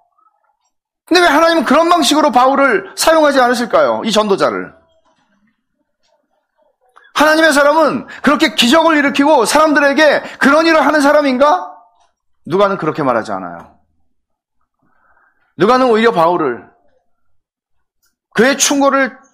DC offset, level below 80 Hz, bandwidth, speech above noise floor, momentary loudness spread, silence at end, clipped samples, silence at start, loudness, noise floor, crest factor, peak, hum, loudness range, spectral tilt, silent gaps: under 0.1%; -52 dBFS; 15.5 kHz; 58 dB; 8 LU; 0.2 s; under 0.1%; 1.1 s; -11 LUFS; -69 dBFS; 14 dB; 0 dBFS; none; 9 LU; -3 dB/octave; none